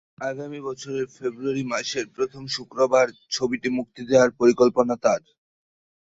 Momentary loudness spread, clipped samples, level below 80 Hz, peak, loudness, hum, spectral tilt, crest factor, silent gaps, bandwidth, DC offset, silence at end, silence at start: 12 LU; under 0.1%; -62 dBFS; -4 dBFS; -23 LUFS; none; -4.5 dB/octave; 18 dB; none; 8 kHz; under 0.1%; 0.95 s; 0.2 s